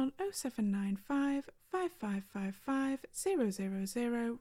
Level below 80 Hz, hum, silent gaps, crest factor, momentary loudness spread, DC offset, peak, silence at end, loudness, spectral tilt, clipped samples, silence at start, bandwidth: -68 dBFS; none; none; 14 dB; 6 LU; under 0.1%; -22 dBFS; 0 s; -37 LUFS; -5.5 dB/octave; under 0.1%; 0 s; 16 kHz